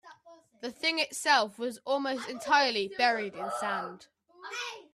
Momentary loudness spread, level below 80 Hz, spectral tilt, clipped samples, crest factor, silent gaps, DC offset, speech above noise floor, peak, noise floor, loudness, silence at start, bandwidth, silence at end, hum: 15 LU; -78 dBFS; -1.5 dB/octave; under 0.1%; 20 dB; none; under 0.1%; 27 dB; -12 dBFS; -57 dBFS; -29 LUFS; 0.05 s; 15.5 kHz; 0.1 s; none